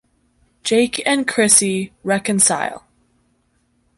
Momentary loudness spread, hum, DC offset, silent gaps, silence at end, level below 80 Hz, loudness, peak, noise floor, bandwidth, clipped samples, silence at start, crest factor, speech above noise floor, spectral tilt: 12 LU; none; under 0.1%; none; 1.2 s; -58 dBFS; -16 LUFS; 0 dBFS; -63 dBFS; 12 kHz; under 0.1%; 0.65 s; 20 dB; 46 dB; -2.5 dB/octave